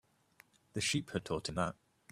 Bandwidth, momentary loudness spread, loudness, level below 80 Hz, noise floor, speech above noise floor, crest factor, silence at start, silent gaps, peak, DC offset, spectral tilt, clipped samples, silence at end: 15 kHz; 9 LU; -37 LUFS; -64 dBFS; -67 dBFS; 30 dB; 22 dB; 0.75 s; none; -18 dBFS; under 0.1%; -4 dB/octave; under 0.1%; 0.4 s